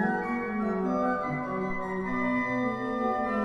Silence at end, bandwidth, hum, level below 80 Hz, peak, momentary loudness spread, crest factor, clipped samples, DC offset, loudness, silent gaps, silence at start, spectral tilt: 0 s; 9.4 kHz; none; -54 dBFS; -16 dBFS; 4 LU; 14 dB; under 0.1%; under 0.1%; -29 LUFS; none; 0 s; -8 dB/octave